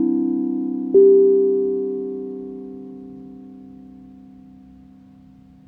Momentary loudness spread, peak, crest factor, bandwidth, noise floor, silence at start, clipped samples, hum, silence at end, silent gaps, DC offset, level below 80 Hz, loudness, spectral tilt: 27 LU; -4 dBFS; 16 dB; 1.2 kHz; -47 dBFS; 0 s; under 0.1%; none; 1.6 s; none; under 0.1%; -60 dBFS; -18 LUFS; -12.5 dB/octave